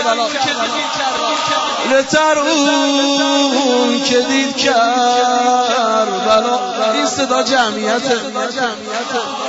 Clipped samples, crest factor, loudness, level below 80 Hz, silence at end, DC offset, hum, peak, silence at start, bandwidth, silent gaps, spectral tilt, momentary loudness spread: under 0.1%; 12 dB; -14 LUFS; -58 dBFS; 0 s; under 0.1%; none; -2 dBFS; 0 s; 8 kHz; none; -2 dB/octave; 5 LU